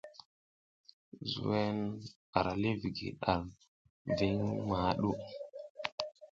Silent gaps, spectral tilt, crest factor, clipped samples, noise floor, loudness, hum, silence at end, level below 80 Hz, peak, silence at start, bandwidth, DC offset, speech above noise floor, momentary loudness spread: 0.25-0.84 s, 0.93-1.12 s, 2.16-2.33 s, 3.68-4.05 s, 5.70-5.75 s, 5.92-5.98 s; -7 dB/octave; 24 dB; under 0.1%; under -90 dBFS; -36 LUFS; none; 0.05 s; -58 dBFS; -12 dBFS; 0.05 s; 7.6 kHz; under 0.1%; over 56 dB; 14 LU